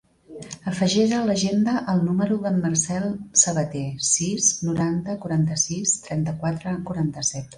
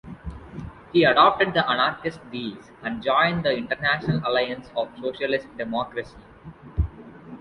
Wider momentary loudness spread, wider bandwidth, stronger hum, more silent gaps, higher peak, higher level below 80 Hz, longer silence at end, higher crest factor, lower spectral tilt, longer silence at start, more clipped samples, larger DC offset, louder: second, 9 LU vs 20 LU; about the same, 11.5 kHz vs 10.5 kHz; neither; neither; about the same, -4 dBFS vs -2 dBFS; second, -54 dBFS vs -42 dBFS; about the same, 0 s vs 0 s; about the same, 20 dB vs 22 dB; second, -4 dB/octave vs -7 dB/octave; first, 0.3 s vs 0.05 s; neither; neither; about the same, -22 LUFS vs -23 LUFS